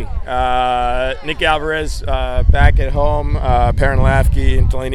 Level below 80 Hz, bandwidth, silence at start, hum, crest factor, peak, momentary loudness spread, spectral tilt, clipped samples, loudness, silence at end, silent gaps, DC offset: -16 dBFS; 12.5 kHz; 0 s; none; 14 dB; 0 dBFS; 7 LU; -6 dB/octave; under 0.1%; -16 LUFS; 0 s; none; under 0.1%